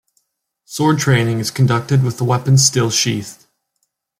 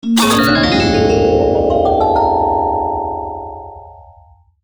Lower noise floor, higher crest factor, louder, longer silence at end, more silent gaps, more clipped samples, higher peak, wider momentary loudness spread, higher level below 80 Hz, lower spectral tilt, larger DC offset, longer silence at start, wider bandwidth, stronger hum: first, -71 dBFS vs -46 dBFS; about the same, 16 dB vs 12 dB; about the same, -15 LUFS vs -13 LUFS; first, 0.85 s vs 0.6 s; neither; neither; about the same, 0 dBFS vs -2 dBFS; second, 8 LU vs 15 LU; second, -54 dBFS vs -32 dBFS; about the same, -4.5 dB/octave vs -5 dB/octave; neither; first, 0.7 s vs 0.05 s; second, 15.5 kHz vs over 20 kHz; neither